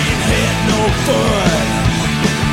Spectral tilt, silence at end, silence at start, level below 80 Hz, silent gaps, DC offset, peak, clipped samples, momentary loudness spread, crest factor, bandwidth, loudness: -4.5 dB/octave; 0 s; 0 s; -26 dBFS; none; under 0.1%; -2 dBFS; under 0.1%; 2 LU; 12 dB; 16.5 kHz; -14 LUFS